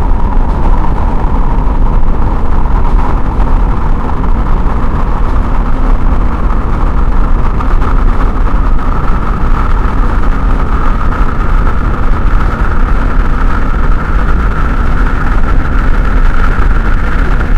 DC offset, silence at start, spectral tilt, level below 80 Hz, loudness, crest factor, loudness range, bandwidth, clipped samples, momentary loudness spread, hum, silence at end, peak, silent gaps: under 0.1%; 0 s; -8 dB/octave; -8 dBFS; -14 LUFS; 8 dB; 1 LU; 4.7 kHz; 0.8%; 2 LU; none; 0 s; 0 dBFS; none